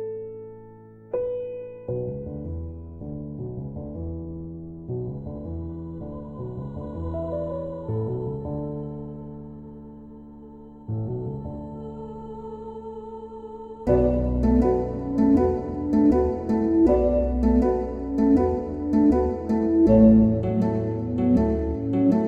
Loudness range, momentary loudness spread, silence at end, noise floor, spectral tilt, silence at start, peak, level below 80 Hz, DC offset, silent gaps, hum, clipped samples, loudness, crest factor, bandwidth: 15 LU; 19 LU; 0 s; -46 dBFS; -11 dB/octave; 0 s; -4 dBFS; -36 dBFS; under 0.1%; none; none; under 0.1%; -24 LUFS; 20 dB; 6.2 kHz